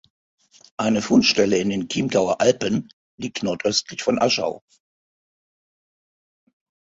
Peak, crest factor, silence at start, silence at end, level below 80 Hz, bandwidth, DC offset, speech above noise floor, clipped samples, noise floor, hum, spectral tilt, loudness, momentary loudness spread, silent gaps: -2 dBFS; 20 dB; 0.8 s; 2.25 s; -58 dBFS; 7.8 kHz; under 0.1%; over 70 dB; under 0.1%; under -90 dBFS; none; -4 dB/octave; -21 LUFS; 12 LU; 2.93-3.18 s